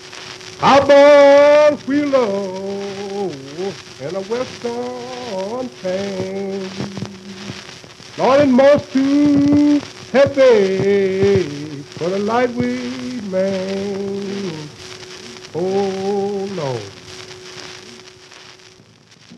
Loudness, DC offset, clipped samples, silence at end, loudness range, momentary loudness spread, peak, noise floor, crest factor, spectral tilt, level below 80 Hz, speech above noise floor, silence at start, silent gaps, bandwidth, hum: -16 LUFS; under 0.1%; under 0.1%; 0.05 s; 12 LU; 22 LU; -2 dBFS; -47 dBFS; 16 dB; -5.5 dB/octave; -56 dBFS; 32 dB; 0 s; none; 10.5 kHz; none